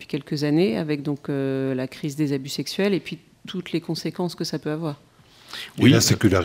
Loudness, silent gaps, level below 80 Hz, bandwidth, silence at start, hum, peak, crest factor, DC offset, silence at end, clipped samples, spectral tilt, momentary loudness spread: -23 LUFS; none; -60 dBFS; 16 kHz; 0 s; none; -2 dBFS; 22 dB; under 0.1%; 0 s; under 0.1%; -5 dB/octave; 17 LU